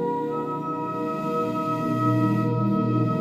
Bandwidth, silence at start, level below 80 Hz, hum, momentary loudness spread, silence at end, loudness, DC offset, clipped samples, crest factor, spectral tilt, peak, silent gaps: 14 kHz; 0 s; -60 dBFS; none; 6 LU; 0 s; -25 LUFS; under 0.1%; under 0.1%; 14 dB; -9 dB/octave; -10 dBFS; none